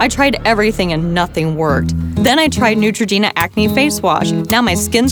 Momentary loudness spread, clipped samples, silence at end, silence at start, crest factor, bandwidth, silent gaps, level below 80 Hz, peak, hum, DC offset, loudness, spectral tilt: 4 LU; under 0.1%; 0 s; 0 s; 14 dB; over 20 kHz; none; -34 dBFS; 0 dBFS; none; under 0.1%; -14 LUFS; -4.5 dB/octave